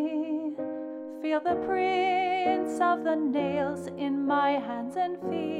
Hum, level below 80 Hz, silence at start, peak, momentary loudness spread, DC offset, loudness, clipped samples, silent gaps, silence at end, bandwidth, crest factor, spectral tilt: none; -68 dBFS; 0 s; -14 dBFS; 8 LU; under 0.1%; -28 LUFS; under 0.1%; none; 0 s; 11.5 kHz; 14 dB; -6 dB/octave